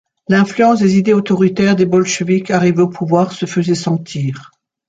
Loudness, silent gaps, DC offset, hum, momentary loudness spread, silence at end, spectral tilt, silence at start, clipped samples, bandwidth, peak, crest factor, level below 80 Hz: -14 LUFS; none; under 0.1%; none; 7 LU; 0.45 s; -6 dB/octave; 0.3 s; under 0.1%; 8 kHz; -2 dBFS; 12 dB; -54 dBFS